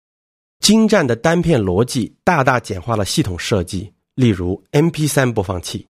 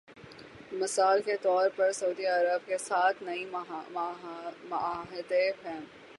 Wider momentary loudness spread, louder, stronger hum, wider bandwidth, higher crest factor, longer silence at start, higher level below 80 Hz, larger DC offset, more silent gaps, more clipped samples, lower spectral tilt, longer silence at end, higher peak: second, 8 LU vs 15 LU; first, -17 LUFS vs -30 LUFS; neither; first, 15 kHz vs 11.5 kHz; about the same, 16 dB vs 16 dB; first, 0.6 s vs 0.1 s; first, -42 dBFS vs -74 dBFS; neither; neither; neither; first, -5 dB/octave vs -2.5 dB/octave; first, 0.2 s vs 0 s; first, 0 dBFS vs -14 dBFS